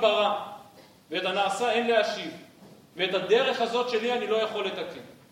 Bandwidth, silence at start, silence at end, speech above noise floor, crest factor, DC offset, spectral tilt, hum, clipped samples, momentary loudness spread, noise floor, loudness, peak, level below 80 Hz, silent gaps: 16 kHz; 0 s; 0.2 s; 26 dB; 18 dB; under 0.1%; -3.5 dB/octave; none; under 0.1%; 17 LU; -53 dBFS; -26 LUFS; -8 dBFS; -76 dBFS; none